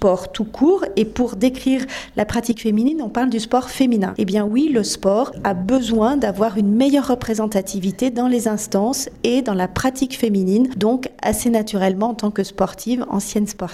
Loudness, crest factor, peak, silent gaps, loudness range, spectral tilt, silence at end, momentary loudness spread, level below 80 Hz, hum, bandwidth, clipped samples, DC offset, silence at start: -19 LUFS; 14 dB; -4 dBFS; none; 2 LU; -5.5 dB/octave; 0 s; 5 LU; -44 dBFS; none; 15.5 kHz; under 0.1%; under 0.1%; 0 s